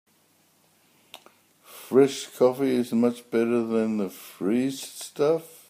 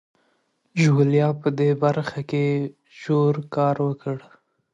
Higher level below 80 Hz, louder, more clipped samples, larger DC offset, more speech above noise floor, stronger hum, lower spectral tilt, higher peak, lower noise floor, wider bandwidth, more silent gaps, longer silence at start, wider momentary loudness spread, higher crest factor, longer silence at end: second, -76 dBFS vs -66 dBFS; second, -25 LUFS vs -22 LUFS; neither; neither; second, 39 dB vs 47 dB; neither; second, -5.5 dB/octave vs -8 dB/octave; about the same, -6 dBFS vs -8 dBFS; second, -63 dBFS vs -68 dBFS; first, 15.5 kHz vs 7.8 kHz; neither; first, 1.7 s vs 0.75 s; about the same, 11 LU vs 13 LU; about the same, 20 dB vs 16 dB; second, 0.25 s vs 0.55 s